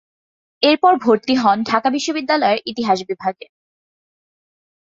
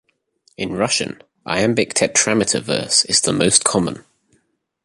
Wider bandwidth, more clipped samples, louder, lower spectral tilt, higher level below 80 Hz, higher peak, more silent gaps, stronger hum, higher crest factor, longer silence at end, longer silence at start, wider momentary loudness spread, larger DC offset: second, 7.6 kHz vs 11.5 kHz; neither; about the same, -17 LUFS vs -17 LUFS; first, -4 dB/octave vs -2.5 dB/octave; second, -64 dBFS vs -52 dBFS; about the same, 0 dBFS vs 0 dBFS; neither; neither; about the same, 18 dB vs 20 dB; first, 1.55 s vs 0.85 s; about the same, 0.6 s vs 0.6 s; second, 7 LU vs 13 LU; neither